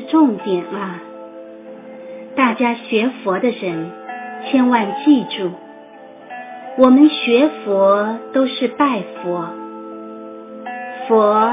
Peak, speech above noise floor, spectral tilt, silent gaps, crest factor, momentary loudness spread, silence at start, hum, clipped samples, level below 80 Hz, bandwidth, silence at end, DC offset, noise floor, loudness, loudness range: 0 dBFS; 24 dB; -9.5 dB/octave; none; 18 dB; 21 LU; 0 s; none; under 0.1%; -68 dBFS; 3.8 kHz; 0 s; under 0.1%; -39 dBFS; -16 LUFS; 6 LU